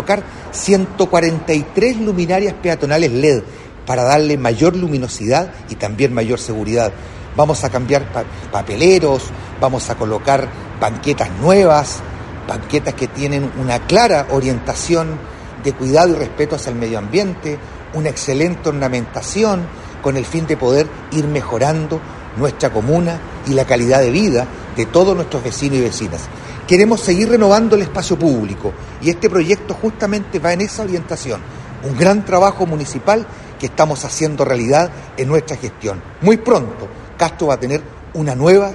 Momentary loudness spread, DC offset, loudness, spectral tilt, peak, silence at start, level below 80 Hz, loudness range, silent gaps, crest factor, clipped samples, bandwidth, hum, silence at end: 13 LU; under 0.1%; -16 LUFS; -5.5 dB/octave; 0 dBFS; 0 s; -38 dBFS; 4 LU; none; 16 dB; under 0.1%; 11.5 kHz; none; 0 s